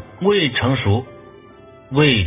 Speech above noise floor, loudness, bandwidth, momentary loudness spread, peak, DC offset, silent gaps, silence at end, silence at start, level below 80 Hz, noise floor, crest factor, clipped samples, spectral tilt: 27 dB; -18 LUFS; 3.9 kHz; 7 LU; -2 dBFS; under 0.1%; none; 0 s; 0 s; -40 dBFS; -43 dBFS; 18 dB; under 0.1%; -10 dB/octave